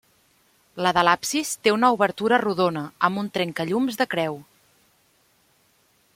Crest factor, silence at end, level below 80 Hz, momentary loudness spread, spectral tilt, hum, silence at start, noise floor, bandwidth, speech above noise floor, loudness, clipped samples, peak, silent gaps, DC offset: 22 dB; 1.75 s; -64 dBFS; 7 LU; -4 dB/octave; none; 0.75 s; -63 dBFS; 16.5 kHz; 41 dB; -22 LUFS; under 0.1%; -2 dBFS; none; under 0.1%